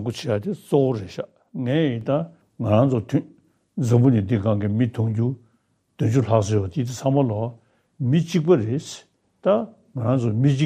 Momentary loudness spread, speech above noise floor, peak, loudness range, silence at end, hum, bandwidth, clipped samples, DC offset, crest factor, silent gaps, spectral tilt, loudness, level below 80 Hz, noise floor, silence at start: 12 LU; 46 dB; -4 dBFS; 2 LU; 0 s; none; 10.5 kHz; under 0.1%; under 0.1%; 18 dB; none; -8 dB/octave; -22 LUFS; -60 dBFS; -66 dBFS; 0 s